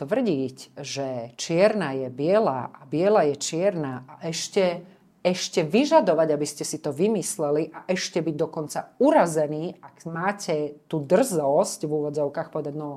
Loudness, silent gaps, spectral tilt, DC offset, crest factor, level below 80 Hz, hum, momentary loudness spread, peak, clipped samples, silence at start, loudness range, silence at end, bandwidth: -24 LUFS; none; -5 dB/octave; under 0.1%; 18 dB; -72 dBFS; none; 12 LU; -6 dBFS; under 0.1%; 0 s; 2 LU; 0 s; 15.5 kHz